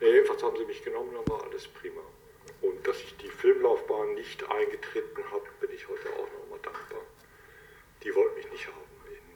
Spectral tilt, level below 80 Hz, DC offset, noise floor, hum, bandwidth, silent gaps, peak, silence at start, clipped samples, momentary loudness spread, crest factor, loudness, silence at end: -5.5 dB/octave; -60 dBFS; under 0.1%; -55 dBFS; none; 20 kHz; none; -10 dBFS; 0 s; under 0.1%; 18 LU; 22 dB; -31 LUFS; 0.05 s